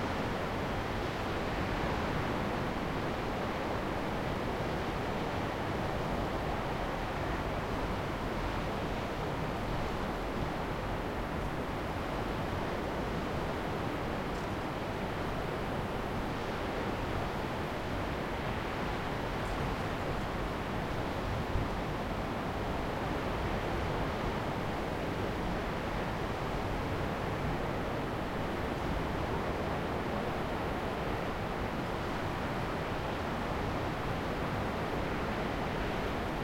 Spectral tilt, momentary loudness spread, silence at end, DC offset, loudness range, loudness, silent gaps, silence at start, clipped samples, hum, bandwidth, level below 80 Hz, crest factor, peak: -6 dB/octave; 2 LU; 0 s; under 0.1%; 1 LU; -35 LUFS; none; 0 s; under 0.1%; none; 16.5 kHz; -44 dBFS; 16 dB; -18 dBFS